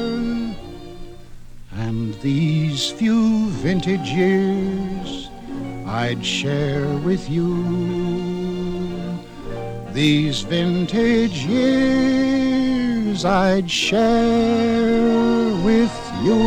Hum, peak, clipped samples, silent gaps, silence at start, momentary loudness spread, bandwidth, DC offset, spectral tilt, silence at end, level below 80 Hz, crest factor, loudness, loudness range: none; -4 dBFS; under 0.1%; none; 0 s; 13 LU; 11 kHz; under 0.1%; -6 dB/octave; 0 s; -40 dBFS; 16 dB; -19 LUFS; 5 LU